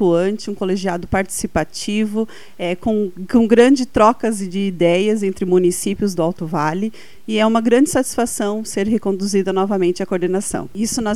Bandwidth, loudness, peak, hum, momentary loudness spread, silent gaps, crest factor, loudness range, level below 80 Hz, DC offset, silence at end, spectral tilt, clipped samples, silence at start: 15.5 kHz; -18 LUFS; 0 dBFS; none; 9 LU; none; 18 dB; 4 LU; -44 dBFS; 2%; 0 s; -5 dB/octave; under 0.1%; 0 s